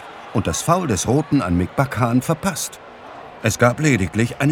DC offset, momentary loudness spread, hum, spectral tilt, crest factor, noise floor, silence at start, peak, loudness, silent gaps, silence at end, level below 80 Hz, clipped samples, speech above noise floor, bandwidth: under 0.1%; 11 LU; none; -5.5 dB/octave; 18 dB; -38 dBFS; 0 s; 0 dBFS; -19 LUFS; none; 0 s; -44 dBFS; under 0.1%; 19 dB; 17.5 kHz